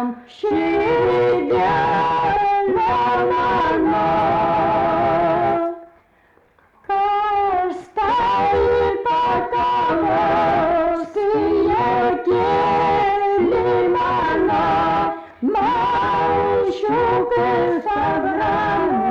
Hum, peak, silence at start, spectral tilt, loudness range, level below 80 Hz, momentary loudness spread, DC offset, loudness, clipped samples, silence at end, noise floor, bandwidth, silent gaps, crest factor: none; -10 dBFS; 0 s; -7 dB/octave; 2 LU; -44 dBFS; 3 LU; under 0.1%; -18 LUFS; under 0.1%; 0 s; -56 dBFS; 7.8 kHz; none; 8 dB